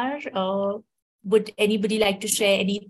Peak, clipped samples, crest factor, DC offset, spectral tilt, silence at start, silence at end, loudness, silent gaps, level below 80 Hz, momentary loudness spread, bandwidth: -6 dBFS; under 0.1%; 18 dB; under 0.1%; -3.5 dB/octave; 0 s; 0.05 s; -23 LUFS; 1.02-1.19 s; -60 dBFS; 8 LU; 13.5 kHz